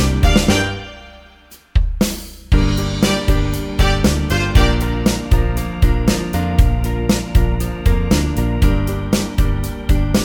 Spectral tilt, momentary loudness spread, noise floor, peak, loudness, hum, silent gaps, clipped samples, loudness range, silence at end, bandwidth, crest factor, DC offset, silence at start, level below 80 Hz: -5.5 dB/octave; 6 LU; -44 dBFS; 0 dBFS; -17 LUFS; none; none; under 0.1%; 2 LU; 0 s; 19 kHz; 14 dB; under 0.1%; 0 s; -18 dBFS